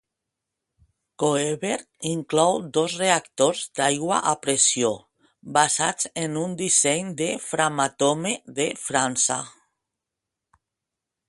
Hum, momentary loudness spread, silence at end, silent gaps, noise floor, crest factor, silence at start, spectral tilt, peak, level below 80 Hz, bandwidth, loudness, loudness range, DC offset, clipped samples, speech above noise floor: none; 8 LU; 1.8 s; none; -85 dBFS; 22 dB; 1.2 s; -2.5 dB/octave; -2 dBFS; -66 dBFS; 11.5 kHz; -23 LUFS; 3 LU; under 0.1%; under 0.1%; 62 dB